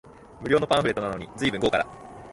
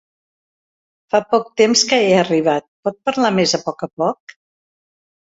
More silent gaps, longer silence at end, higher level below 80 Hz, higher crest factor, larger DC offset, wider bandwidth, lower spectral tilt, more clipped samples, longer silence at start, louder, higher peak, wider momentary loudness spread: second, none vs 2.68-2.83 s, 3.93-3.97 s; second, 0 s vs 1.25 s; first, -52 dBFS vs -62 dBFS; about the same, 18 dB vs 18 dB; neither; first, 11.5 kHz vs 8 kHz; first, -5 dB/octave vs -3.5 dB/octave; neither; second, 0.05 s vs 1.15 s; second, -25 LUFS vs -17 LUFS; second, -8 dBFS vs -2 dBFS; first, 13 LU vs 9 LU